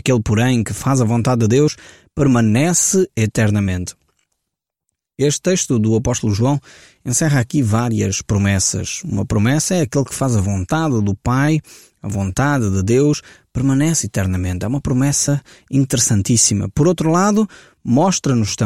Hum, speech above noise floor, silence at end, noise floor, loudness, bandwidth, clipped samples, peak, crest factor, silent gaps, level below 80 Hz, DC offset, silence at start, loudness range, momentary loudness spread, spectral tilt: none; 63 dB; 0 s; -80 dBFS; -17 LUFS; 16 kHz; under 0.1%; -2 dBFS; 16 dB; none; -40 dBFS; 0.1%; 0.05 s; 3 LU; 8 LU; -5 dB/octave